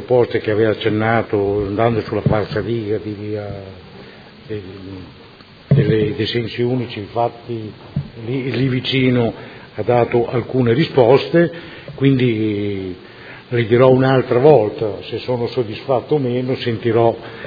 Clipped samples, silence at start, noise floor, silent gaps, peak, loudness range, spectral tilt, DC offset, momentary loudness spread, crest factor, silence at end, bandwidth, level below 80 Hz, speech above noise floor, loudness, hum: under 0.1%; 0 s; -39 dBFS; none; 0 dBFS; 6 LU; -9.5 dB/octave; under 0.1%; 17 LU; 18 dB; 0 s; 5 kHz; -48 dBFS; 22 dB; -17 LUFS; none